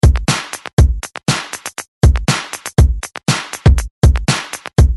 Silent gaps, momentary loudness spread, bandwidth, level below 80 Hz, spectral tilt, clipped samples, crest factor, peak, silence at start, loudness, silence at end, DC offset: 0.73-0.77 s, 1.88-2.01 s, 3.91-4.02 s; 7 LU; 12 kHz; -16 dBFS; -5 dB/octave; under 0.1%; 14 dB; 0 dBFS; 0.05 s; -16 LUFS; 0 s; under 0.1%